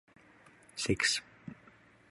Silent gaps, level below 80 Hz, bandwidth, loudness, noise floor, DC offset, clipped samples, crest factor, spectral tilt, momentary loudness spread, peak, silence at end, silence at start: none; -58 dBFS; 11.5 kHz; -32 LUFS; -61 dBFS; under 0.1%; under 0.1%; 22 dB; -2.5 dB/octave; 22 LU; -16 dBFS; 0.55 s; 0.75 s